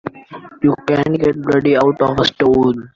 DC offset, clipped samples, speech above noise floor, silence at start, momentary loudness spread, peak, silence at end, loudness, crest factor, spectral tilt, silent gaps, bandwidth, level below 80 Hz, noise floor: under 0.1%; under 0.1%; 22 dB; 0.05 s; 4 LU; -2 dBFS; 0.1 s; -15 LUFS; 12 dB; -7 dB/octave; none; 7.4 kHz; -44 dBFS; -36 dBFS